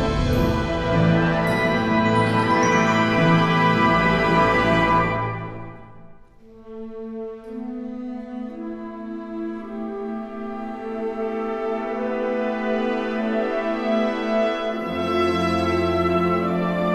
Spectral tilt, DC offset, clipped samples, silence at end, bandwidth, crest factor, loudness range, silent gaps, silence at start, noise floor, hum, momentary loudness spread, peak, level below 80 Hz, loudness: -6.5 dB/octave; under 0.1%; under 0.1%; 0 s; 13 kHz; 16 dB; 14 LU; none; 0 s; -46 dBFS; none; 15 LU; -6 dBFS; -40 dBFS; -21 LUFS